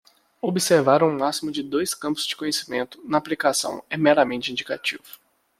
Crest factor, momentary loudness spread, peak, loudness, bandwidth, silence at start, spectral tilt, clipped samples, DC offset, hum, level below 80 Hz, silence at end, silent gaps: 20 dB; 10 LU; -4 dBFS; -23 LUFS; 16 kHz; 0.45 s; -3.5 dB/octave; under 0.1%; under 0.1%; none; -66 dBFS; 0.6 s; none